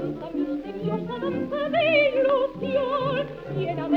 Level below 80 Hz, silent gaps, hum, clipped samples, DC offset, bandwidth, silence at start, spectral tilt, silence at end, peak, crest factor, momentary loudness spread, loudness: -54 dBFS; none; none; under 0.1%; under 0.1%; 6.2 kHz; 0 s; -8 dB/octave; 0 s; -8 dBFS; 16 dB; 10 LU; -25 LUFS